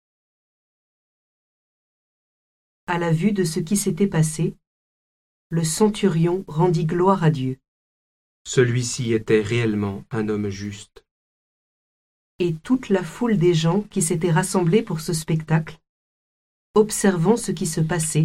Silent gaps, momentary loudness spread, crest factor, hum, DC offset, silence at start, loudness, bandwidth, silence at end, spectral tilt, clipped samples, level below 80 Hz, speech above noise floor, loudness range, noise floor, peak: 4.67-5.50 s, 7.68-8.45 s, 11.11-12.39 s, 15.89-16.74 s; 9 LU; 18 dB; none; under 0.1%; 2.9 s; -21 LUFS; 15.5 kHz; 0 s; -5.5 dB/octave; under 0.1%; -52 dBFS; over 70 dB; 6 LU; under -90 dBFS; -4 dBFS